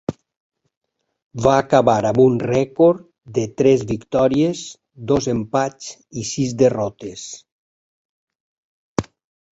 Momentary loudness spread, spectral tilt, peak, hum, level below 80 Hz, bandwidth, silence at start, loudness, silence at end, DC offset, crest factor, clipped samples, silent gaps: 17 LU; -6 dB/octave; -2 dBFS; none; -50 dBFS; 8 kHz; 0.1 s; -18 LUFS; 0.5 s; under 0.1%; 18 dB; under 0.1%; 0.37-0.52 s, 0.77-0.81 s, 1.22-1.30 s, 7.52-8.27 s, 8.35-8.96 s